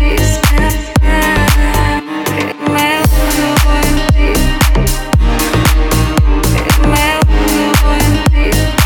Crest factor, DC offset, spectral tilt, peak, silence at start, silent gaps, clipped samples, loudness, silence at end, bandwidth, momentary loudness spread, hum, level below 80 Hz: 10 dB; under 0.1%; -4.5 dB/octave; 0 dBFS; 0 s; none; under 0.1%; -12 LUFS; 0 s; 19.5 kHz; 3 LU; none; -12 dBFS